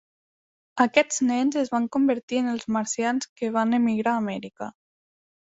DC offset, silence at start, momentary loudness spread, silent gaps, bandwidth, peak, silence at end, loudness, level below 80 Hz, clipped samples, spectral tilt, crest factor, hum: under 0.1%; 0.75 s; 12 LU; 2.23-2.28 s, 3.29-3.36 s; 8 kHz; -4 dBFS; 0.85 s; -24 LUFS; -68 dBFS; under 0.1%; -4 dB/octave; 22 dB; none